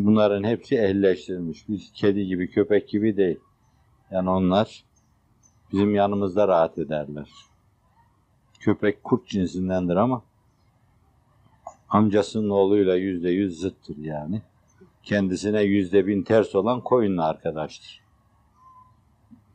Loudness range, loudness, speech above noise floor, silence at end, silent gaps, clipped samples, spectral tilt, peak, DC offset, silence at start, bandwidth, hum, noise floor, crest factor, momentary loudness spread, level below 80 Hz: 4 LU; -23 LUFS; 40 dB; 1.6 s; none; under 0.1%; -7.5 dB/octave; -4 dBFS; under 0.1%; 0 s; 9.2 kHz; none; -62 dBFS; 20 dB; 12 LU; -62 dBFS